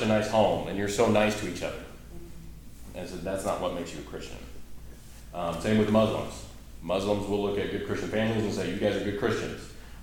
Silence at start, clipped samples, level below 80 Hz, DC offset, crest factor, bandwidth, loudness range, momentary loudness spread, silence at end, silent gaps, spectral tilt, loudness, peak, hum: 0 s; under 0.1%; -46 dBFS; under 0.1%; 20 dB; 18.5 kHz; 8 LU; 23 LU; 0 s; none; -5.5 dB/octave; -28 LUFS; -10 dBFS; none